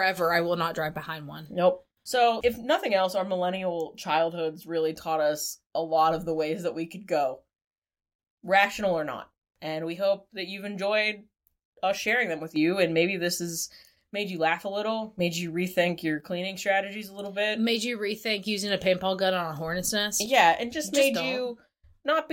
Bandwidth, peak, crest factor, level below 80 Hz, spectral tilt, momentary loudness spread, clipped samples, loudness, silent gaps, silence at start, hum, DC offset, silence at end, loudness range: 17 kHz; -6 dBFS; 22 dB; -62 dBFS; -3.5 dB/octave; 11 LU; under 0.1%; -27 LUFS; 7.67-7.71 s, 7.78-7.82 s, 8.15-8.19 s, 8.30-8.37 s, 11.65-11.72 s; 0 s; none; under 0.1%; 0 s; 4 LU